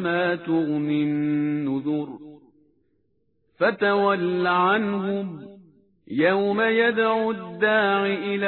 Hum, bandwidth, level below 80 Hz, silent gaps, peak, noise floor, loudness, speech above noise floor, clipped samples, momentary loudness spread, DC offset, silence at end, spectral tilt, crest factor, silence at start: none; 4.4 kHz; -68 dBFS; none; -8 dBFS; -70 dBFS; -22 LUFS; 48 dB; under 0.1%; 9 LU; under 0.1%; 0 s; -9.5 dB/octave; 16 dB; 0 s